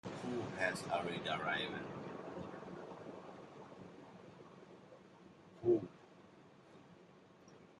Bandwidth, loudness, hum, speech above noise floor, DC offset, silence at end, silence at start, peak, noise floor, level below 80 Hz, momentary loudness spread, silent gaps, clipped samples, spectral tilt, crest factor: 11.5 kHz; -41 LUFS; none; 23 dB; under 0.1%; 0 s; 0.05 s; -22 dBFS; -63 dBFS; -78 dBFS; 24 LU; none; under 0.1%; -5 dB/octave; 22 dB